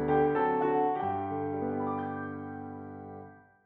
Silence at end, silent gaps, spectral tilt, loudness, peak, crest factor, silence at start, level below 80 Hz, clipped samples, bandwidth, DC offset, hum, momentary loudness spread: 0.25 s; none; -10.5 dB/octave; -31 LUFS; -16 dBFS; 16 dB; 0 s; -60 dBFS; under 0.1%; 4.2 kHz; under 0.1%; none; 18 LU